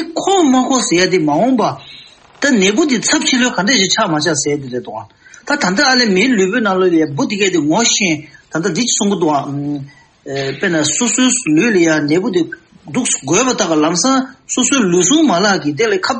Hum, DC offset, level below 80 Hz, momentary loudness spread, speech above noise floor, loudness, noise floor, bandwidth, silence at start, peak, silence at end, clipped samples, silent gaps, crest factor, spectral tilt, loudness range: none; under 0.1%; -56 dBFS; 10 LU; 26 dB; -13 LUFS; -40 dBFS; 8.8 kHz; 0 s; 0 dBFS; 0 s; under 0.1%; none; 14 dB; -3 dB/octave; 2 LU